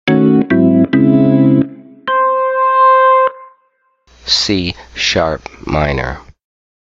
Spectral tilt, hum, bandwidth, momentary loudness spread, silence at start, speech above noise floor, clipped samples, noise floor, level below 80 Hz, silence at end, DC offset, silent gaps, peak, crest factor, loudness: -5.5 dB/octave; none; 7.8 kHz; 13 LU; 0.05 s; 43 dB; under 0.1%; -59 dBFS; -36 dBFS; 0.6 s; under 0.1%; none; 0 dBFS; 12 dB; -12 LUFS